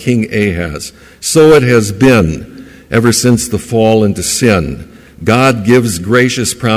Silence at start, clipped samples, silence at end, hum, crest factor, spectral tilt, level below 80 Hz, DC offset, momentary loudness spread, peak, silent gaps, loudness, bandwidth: 0 s; under 0.1%; 0 s; none; 10 dB; -5 dB/octave; -32 dBFS; under 0.1%; 13 LU; 0 dBFS; none; -10 LUFS; 16 kHz